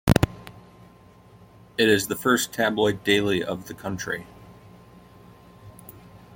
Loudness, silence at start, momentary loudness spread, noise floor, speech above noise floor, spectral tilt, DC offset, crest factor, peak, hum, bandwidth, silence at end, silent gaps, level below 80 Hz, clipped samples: -24 LUFS; 0.05 s; 25 LU; -51 dBFS; 28 dB; -4.5 dB/octave; under 0.1%; 24 dB; -2 dBFS; 60 Hz at -55 dBFS; 17 kHz; 0 s; none; -46 dBFS; under 0.1%